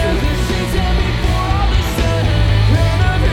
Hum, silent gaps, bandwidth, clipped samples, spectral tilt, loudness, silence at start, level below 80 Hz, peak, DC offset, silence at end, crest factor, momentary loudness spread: none; none; 16 kHz; under 0.1%; -6 dB/octave; -16 LUFS; 0 s; -18 dBFS; -2 dBFS; under 0.1%; 0 s; 12 dB; 4 LU